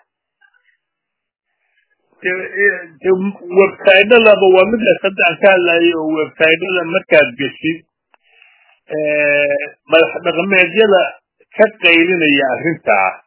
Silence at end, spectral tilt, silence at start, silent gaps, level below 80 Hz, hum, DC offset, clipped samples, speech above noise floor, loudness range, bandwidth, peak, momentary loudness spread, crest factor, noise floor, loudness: 0.1 s; -8.5 dB/octave; 2.25 s; none; -58 dBFS; none; under 0.1%; 0.2%; 65 dB; 6 LU; 4 kHz; 0 dBFS; 11 LU; 14 dB; -78 dBFS; -12 LUFS